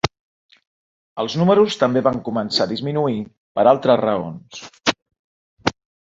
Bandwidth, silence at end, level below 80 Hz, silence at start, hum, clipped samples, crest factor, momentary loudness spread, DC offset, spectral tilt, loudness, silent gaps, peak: 8 kHz; 0.4 s; -52 dBFS; 0.05 s; none; under 0.1%; 18 dB; 14 LU; under 0.1%; -5.5 dB/octave; -19 LUFS; 0.20-0.49 s, 0.67-1.16 s, 3.37-3.55 s, 5.02-5.06 s, 5.19-5.57 s; -2 dBFS